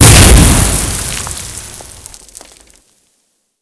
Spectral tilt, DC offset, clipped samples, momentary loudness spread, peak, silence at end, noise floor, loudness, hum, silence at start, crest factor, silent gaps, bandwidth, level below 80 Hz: -3.5 dB/octave; under 0.1%; 2%; 27 LU; 0 dBFS; 1.8 s; -61 dBFS; -8 LUFS; none; 0 s; 10 dB; none; 11 kHz; -16 dBFS